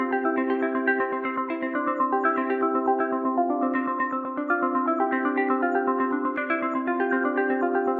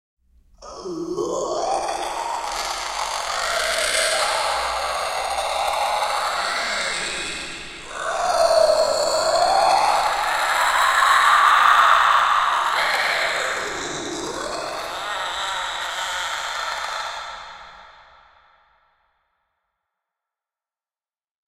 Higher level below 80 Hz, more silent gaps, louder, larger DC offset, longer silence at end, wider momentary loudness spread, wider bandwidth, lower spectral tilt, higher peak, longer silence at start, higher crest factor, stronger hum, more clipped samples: second, -78 dBFS vs -52 dBFS; neither; second, -25 LUFS vs -20 LUFS; second, under 0.1% vs 0.1%; second, 0 s vs 3.55 s; second, 3 LU vs 13 LU; second, 4.3 kHz vs 16.5 kHz; first, -7.5 dB/octave vs -0.5 dB/octave; second, -10 dBFS vs -2 dBFS; second, 0 s vs 0.6 s; second, 14 dB vs 20 dB; neither; neither